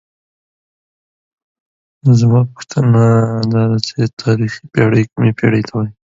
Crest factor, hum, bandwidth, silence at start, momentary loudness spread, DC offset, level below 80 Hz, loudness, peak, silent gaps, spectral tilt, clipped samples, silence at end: 14 dB; none; 7.8 kHz; 2.05 s; 8 LU; under 0.1%; -48 dBFS; -14 LUFS; 0 dBFS; 4.13-4.17 s; -7.5 dB/octave; under 0.1%; 0.25 s